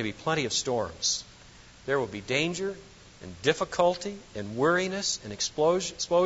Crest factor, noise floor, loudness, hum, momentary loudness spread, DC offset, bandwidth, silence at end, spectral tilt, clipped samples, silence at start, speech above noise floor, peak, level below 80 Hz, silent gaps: 20 dB; -52 dBFS; -28 LUFS; none; 13 LU; under 0.1%; 8 kHz; 0 s; -3 dB/octave; under 0.1%; 0 s; 23 dB; -8 dBFS; -58 dBFS; none